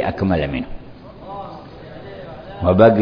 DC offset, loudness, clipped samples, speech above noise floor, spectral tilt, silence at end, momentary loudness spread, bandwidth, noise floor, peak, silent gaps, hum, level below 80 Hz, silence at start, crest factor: under 0.1%; -18 LUFS; under 0.1%; 23 dB; -10 dB/octave; 0 s; 23 LU; 5.2 kHz; -38 dBFS; 0 dBFS; none; none; -38 dBFS; 0 s; 18 dB